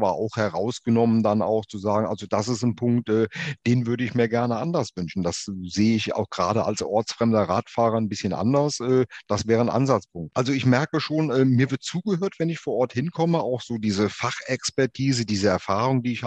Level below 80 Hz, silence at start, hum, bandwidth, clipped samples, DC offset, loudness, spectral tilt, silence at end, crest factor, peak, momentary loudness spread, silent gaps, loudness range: -58 dBFS; 0 s; none; 9 kHz; under 0.1%; under 0.1%; -24 LUFS; -6 dB/octave; 0 s; 18 dB; -4 dBFS; 6 LU; none; 2 LU